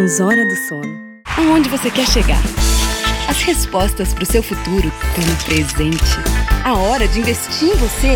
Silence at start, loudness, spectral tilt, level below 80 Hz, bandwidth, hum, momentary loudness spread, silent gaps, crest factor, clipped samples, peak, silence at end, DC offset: 0 s; -16 LUFS; -4 dB/octave; -20 dBFS; 18 kHz; none; 6 LU; none; 14 dB; under 0.1%; 0 dBFS; 0 s; under 0.1%